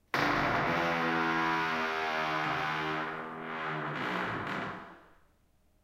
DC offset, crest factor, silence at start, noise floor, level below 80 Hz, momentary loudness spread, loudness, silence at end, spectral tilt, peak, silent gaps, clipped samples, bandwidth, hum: under 0.1%; 20 dB; 0.15 s; -68 dBFS; -60 dBFS; 9 LU; -32 LUFS; 0.8 s; -5 dB/octave; -14 dBFS; none; under 0.1%; 16.5 kHz; none